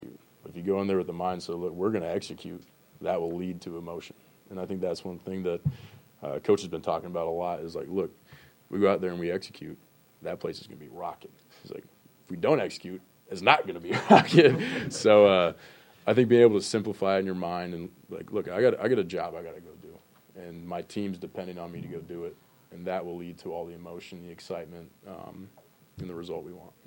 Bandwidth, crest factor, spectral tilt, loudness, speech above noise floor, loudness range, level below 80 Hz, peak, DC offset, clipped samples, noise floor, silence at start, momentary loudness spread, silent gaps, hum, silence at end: 16.5 kHz; 26 dB; -6 dB/octave; -27 LUFS; 25 dB; 17 LU; -66 dBFS; -2 dBFS; under 0.1%; under 0.1%; -53 dBFS; 0 s; 23 LU; none; none; 0.2 s